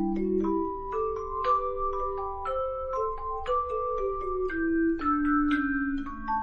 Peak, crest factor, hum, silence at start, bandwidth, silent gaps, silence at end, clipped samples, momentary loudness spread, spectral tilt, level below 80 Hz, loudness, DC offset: -16 dBFS; 12 dB; none; 0 s; 7 kHz; none; 0 s; under 0.1%; 7 LU; -8 dB/octave; -42 dBFS; -29 LUFS; under 0.1%